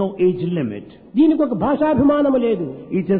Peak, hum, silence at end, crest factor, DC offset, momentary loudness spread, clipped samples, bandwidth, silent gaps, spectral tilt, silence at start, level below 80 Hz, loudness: -6 dBFS; none; 0 s; 12 dB; under 0.1%; 9 LU; under 0.1%; 4.2 kHz; none; -12 dB/octave; 0 s; -48 dBFS; -18 LUFS